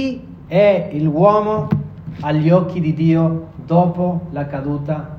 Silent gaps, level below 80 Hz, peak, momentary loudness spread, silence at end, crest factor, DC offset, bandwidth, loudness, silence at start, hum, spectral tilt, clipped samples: none; -46 dBFS; 0 dBFS; 11 LU; 0 s; 16 dB; under 0.1%; 6 kHz; -17 LUFS; 0 s; none; -10 dB/octave; under 0.1%